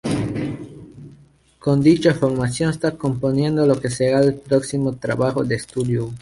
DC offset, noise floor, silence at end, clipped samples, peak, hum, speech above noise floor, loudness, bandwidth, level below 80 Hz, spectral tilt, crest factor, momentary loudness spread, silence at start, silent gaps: under 0.1%; -51 dBFS; 0 s; under 0.1%; -4 dBFS; none; 32 dB; -20 LUFS; 11.5 kHz; -48 dBFS; -6.5 dB/octave; 16 dB; 10 LU; 0.05 s; none